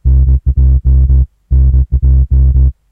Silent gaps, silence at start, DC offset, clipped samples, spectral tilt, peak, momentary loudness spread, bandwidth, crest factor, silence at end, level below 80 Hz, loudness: none; 0.05 s; 0.8%; under 0.1%; -13 dB/octave; -2 dBFS; 3 LU; 0.9 kHz; 8 dB; 0.2 s; -8 dBFS; -11 LUFS